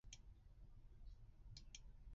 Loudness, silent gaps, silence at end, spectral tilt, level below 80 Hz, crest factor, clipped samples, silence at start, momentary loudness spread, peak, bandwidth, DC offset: -64 LUFS; none; 0 s; -4 dB/octave; -62 dBFS; 18 dB; under 0.1%; 0.05 s; 7 LU; -42 dBFS; 7.4 kHz; under 0.1%